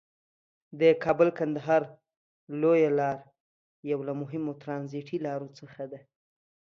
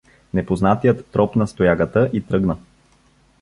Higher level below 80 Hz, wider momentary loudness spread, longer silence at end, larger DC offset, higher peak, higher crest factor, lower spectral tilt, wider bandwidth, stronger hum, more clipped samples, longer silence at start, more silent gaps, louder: second, -72 dBFS vs -42 dBFS; first, 18 LU vs 8 LU; about the same, 0.8 s vs 0.8 s; neither; second, -10 dBFS vs -2 dBFS; about the same, 20 dB vs 18 dB; about the same, -8 dB/octave vs -8.5 dB/octave; second, 6.6 kHz vs 11.5 kHz; neither; neither; first, 0.75 s vs 0.35 s; first, 2.17-2.47 s, 3.40-3.83 s vs none; second, -28 LUFS vs -19 LUFS